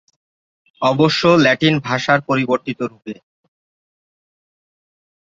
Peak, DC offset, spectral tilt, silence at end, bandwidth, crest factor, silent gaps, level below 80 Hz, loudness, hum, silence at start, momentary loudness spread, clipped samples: 0 dBFS; under 0.1%; -5.5 dB/octave; 2.15 s; 7.8 kHz; 18 dB; none; -58 dBFS; -16 LUFS; none; 0.8 s; 17 LU; under 0.1%